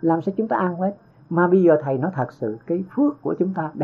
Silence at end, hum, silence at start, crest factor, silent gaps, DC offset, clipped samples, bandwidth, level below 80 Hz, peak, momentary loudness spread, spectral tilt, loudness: 0 s; none; 0 s; 16 dB; none; under 0.1%; under 0.1%; 4.4 kHz; -68 dBFS; -6 dBFS; 10 LU; -11 dB/octave; -22 LUFS